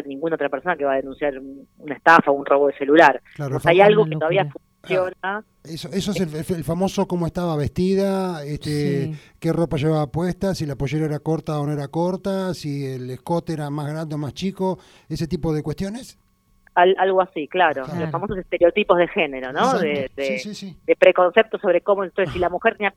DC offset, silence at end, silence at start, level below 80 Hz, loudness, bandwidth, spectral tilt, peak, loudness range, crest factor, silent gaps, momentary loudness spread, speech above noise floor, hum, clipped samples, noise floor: under 0.1%; 0.05 s; 0 s; -48 dBFS; -21 LUFS; 15 kHz; -6.5 dB/octave; 0 dBFS; 9 LU; 20 dB; none; 13 LU; 38 dB; none; under 0.1%; -58 dBFS